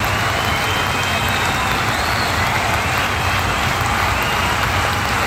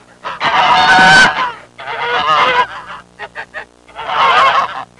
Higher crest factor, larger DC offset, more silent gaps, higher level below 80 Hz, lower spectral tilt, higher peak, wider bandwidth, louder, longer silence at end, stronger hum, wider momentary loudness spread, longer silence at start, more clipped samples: about the same, 16 dB vs 12 dB; neither; neither; first, -32 dBFS vs -46 dBFS; first, -3.5 dB/octave vs -2 dB/octave; about the same, -2 dBFS vs 0 dBFS; first, over 20 kHz vs 11.5 kHz; second, -17 LUFS vs -10 LUFS; second, 0 s vs 0.15 s; second, none vs 60 Hz at -50 dBFS; second, 1 LU vs 23 LU; second, 0 s vs 0.25 s; neither